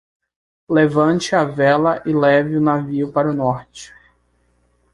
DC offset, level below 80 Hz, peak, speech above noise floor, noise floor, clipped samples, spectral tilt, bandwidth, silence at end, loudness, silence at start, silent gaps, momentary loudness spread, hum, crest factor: under 0.1%; -54 dBFS; -2 dBFS; 45 dB; -61 dBFS; under 0.1%; -6.5 dB/octave; 11.5 kHz; 1.1 s; -17 LUFS; 0.7 s; none; 7 LU; 60 Hz at -50 dBFS; 16 dB